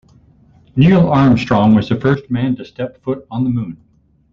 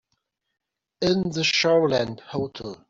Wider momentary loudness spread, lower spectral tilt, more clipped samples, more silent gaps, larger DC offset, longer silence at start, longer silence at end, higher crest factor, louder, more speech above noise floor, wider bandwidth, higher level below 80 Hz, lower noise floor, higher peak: about the same, 13 LU vs 12 LU; first, -9 dB/octave vs -4.5 dB/octave; neither; neither; neither; second, 0.75 s vs 1 s; first, 0.6 s vs 0.15 s; about the same, 16 dB vs 16 dB; first, -15 LUFS vs -23 LUFS; second, 35 dB vs 53 dB; about the same, 7.2 kHz vs 7.8 kHz; first, -42 dBFS vs -58 dBFS; second, -48 dBFS vs -76 dBFS; first, 0 dBFS vs -10 dBFS